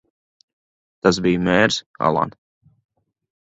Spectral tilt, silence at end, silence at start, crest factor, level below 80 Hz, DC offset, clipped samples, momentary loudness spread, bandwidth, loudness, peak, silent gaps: -5 dB/octave; 1.15 s; 1.05 s; 22 dB; -50 dBFS; under 0.1%; under 0.1%; 6 LU; 8.2 kHz; -19 LUFS; 0 dBFS; 1.86-1.94 s